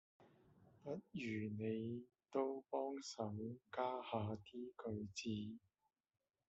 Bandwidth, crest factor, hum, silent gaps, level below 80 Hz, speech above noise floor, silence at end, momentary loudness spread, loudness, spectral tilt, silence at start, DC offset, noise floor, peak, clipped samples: 7.6 kHz; 20 dB; none; none; -82 dBFS; 24 dB; 0.9 s; 8 LU; -47 LUFS; -5.5 dB/octave; 0.2 s; under 0.1%; -70 dBFS; -28 dBFS; under 0.1%